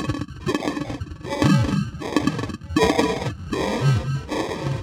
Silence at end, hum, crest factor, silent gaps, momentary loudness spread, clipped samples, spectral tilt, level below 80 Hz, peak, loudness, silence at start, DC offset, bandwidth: 0 s; none; 20 dB; none; 10 LU; under 0.1%; -6 dB/octave; -40 dBFS; -2 dBFS; -23 LUFS; 0 s; under 0.1%; 16 kHz